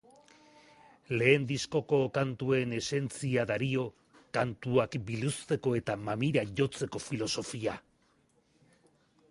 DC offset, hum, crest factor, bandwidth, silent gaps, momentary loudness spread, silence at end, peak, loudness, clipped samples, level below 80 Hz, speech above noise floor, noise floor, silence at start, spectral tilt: under 0.1%; none; 22 dB; 11.5 kHz; none; 8 LU; 1.5 s; -10 dBFS; -32 LUFS; under 0.1%; -64 dBFS; 38 dB; -69 dBFS; 1.1 s; -5.5 dB/octave